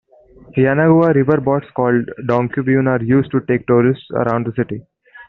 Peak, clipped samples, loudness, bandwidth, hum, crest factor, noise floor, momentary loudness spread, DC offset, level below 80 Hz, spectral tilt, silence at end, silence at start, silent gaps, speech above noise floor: 0 dBFS; under 0.1%; -16 LUFS; 4.3 kHz; none; 14 dB; -44 dBFS; 8 LU; under 0.1%; -52 dBFS; -8 dB/octave; 0.05 s; 0.55 s; none; 29 dB